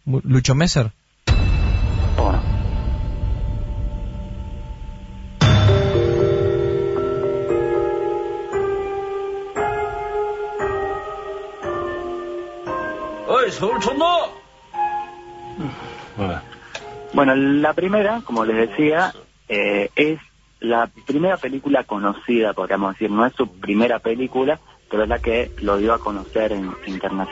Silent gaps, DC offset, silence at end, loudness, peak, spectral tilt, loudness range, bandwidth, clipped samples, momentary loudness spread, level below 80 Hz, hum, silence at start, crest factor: none; under 0.1%; 0 s; -21 LUFS; -2 dBFS; -6.5 dB/octave; 6 LU; 8 kHz; under 0.1%; 13 LU; -30 dBFS; none; 0.05 s; 18 dB